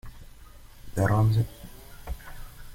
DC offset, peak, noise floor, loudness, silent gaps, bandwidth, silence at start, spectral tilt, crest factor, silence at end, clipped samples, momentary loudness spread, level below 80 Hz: under 0.1%; -10 dBFS; -48 dBFS; -26 LUFS; none; 16.5 kHz; 0.05 s; -7.5 dB/octave; 18 dB; 0 s; under 0.1%; 24 LU; -42 dBFS